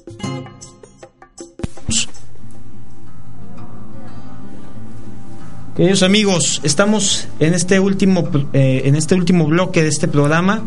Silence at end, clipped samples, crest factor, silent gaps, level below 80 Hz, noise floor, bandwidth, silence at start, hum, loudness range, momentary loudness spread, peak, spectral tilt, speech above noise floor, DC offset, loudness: 0 s; under 0.1%; 16 dB; none; -44 dBFS; -43 dBFS; 11.5 kHz; 0 s; none; 19 LU; 23 LU; 0 dBFS; -4.5 dB/octave; 29 dB; 8%; -15 LUFS